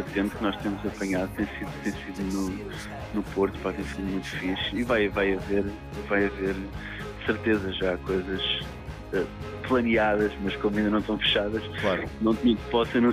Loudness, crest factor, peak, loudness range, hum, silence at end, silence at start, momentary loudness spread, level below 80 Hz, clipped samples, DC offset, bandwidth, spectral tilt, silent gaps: -28 LUFS; 16 dB; -12 dBFS; 5 LU; none; 0 s; 0 s; 10 LU; -44 dBFS; under 0.1%; under 0.1%; 15.5 kHz; -5.5 dB/octave; none